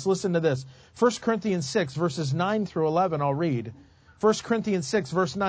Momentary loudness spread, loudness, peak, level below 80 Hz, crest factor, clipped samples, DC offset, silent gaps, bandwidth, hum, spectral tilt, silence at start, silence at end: 4 LU; -26 LUFS; -8 dBFS; -60 dBFS; 18 dB; under 0.1%; under 0.1%; none; 8 kHz; none; -6 dB/octave; 0 s; 0 s